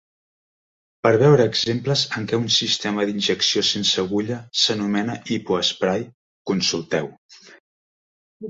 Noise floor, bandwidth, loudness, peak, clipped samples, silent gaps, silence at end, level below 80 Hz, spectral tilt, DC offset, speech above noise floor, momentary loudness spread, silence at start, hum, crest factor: under -90 dBFS; 8 kHz; -20 LUFS; -4 dBFS; under 0.1%; 6.14-6.45 s, 7.18-7.29 s, 7.60-8.40 s; 0 s; -60 dBFS; -4 dB/octave; under 0.1%; over 69 dB; 9 LU; 1.05 s; none; 20 dB